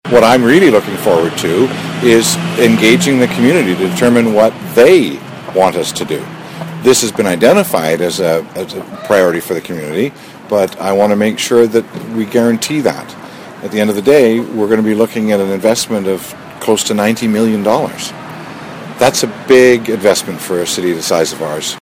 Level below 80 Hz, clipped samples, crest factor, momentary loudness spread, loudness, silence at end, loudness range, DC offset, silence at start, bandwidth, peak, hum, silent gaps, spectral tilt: -50 dBFS; 0.7%; 12 dB; 14 LU; -12 LUFS; 0.05 s; 4 LU; under 0.1%; 0.05 s; 17 kHz; 0 dBFS; none; none; -4.5 dB/octave